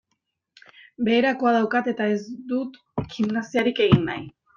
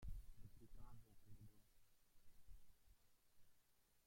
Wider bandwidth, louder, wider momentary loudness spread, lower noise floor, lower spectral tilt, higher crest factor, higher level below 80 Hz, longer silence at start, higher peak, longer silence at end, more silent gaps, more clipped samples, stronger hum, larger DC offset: second, 7.2 kHz vs 16.5 kHz; first, -23 LUFS vs -66 LUFS; first, 12 LU vs 7 LU; about the same, -77 dBFS vs -78 dBFS; first, -7 dB/octave vs -5.5 dB/octave; about the same, 22 dB vs 18 dB; first, -56 dBFS vs -64 dBFS; first, 1 s vs 0 s; first, -2 dBFS vs -42 dBFS; first, 0.3 s vs 0 s; neither; neither; neither; neither